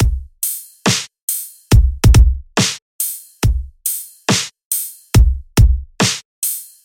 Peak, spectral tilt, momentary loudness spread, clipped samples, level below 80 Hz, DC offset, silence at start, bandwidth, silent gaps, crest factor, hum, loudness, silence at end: 0 dBFS; -4 dB/octave; 9 LU; under 0.1%; -18 dBFS; under 0.1%; 0 s; 17 kHz; 1.22-1.28 s, 2.82-2.99 s, 4.65-4.71 s, 6.25-6.42 s; 16 dB; none; -17 LUFS; 0.2 s